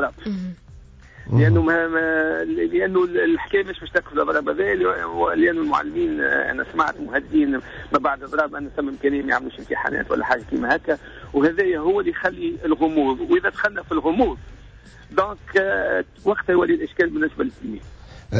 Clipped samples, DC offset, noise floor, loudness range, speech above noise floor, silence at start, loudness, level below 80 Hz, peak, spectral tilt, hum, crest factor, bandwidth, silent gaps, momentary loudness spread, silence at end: under 0.1%; under 0.1%; -44 dBFS; 2 LU; 23 dB; 0 s; -21 LUFS; -44 dBFS; -6 dBFS; -8 dB/octave; none; 14 dB; 7.8 kHz; none; 7 LU; 0 s